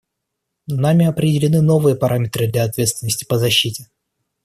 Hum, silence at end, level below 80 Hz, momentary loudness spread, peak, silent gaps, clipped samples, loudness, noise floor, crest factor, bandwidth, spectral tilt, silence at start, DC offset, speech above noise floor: none; 0.6 s; -52 dBFS; 7 LU; -2 dBFS; none; under 0.1%; -17 LUFS; -77 dBFS; 16 dB; 14 kHz; -5 dB/octave; 0.7 s; under 0.1%; 61 dB